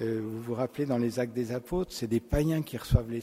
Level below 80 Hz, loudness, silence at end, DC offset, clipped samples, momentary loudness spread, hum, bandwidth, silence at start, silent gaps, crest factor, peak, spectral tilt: -40 dBFS; -31 LUFS; 0 s; under 0.1%; under 0.1%; 5 LU; none; 16 kHz; 0 s; none; 20 dB; -10 dBFS; -7 dB/octave